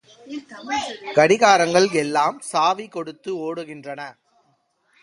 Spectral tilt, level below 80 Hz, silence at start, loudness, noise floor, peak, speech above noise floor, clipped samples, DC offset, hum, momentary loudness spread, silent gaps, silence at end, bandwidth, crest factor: -3.5 dB/octave; -66 dBFS; 0.25 s; -19 LUFS; -66 dBFS; 0 dBFS; 45 dB; under 0.1%; under 0.1%; none; 20 LU; none; 0.9 s; 11.5 kHz; 20 dB